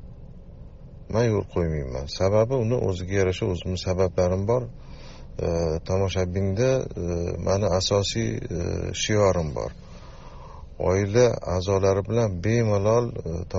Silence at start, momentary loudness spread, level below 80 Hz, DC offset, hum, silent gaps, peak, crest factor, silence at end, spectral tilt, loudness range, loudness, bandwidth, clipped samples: 0 s; 18 LU; -40 dBFS; under 0.1%; none; none; -6 dBFS; 18 dB; 0 s; -6 dB/octave; 3 LU; -24 LUFS; 7.6 kHz; under 0.1%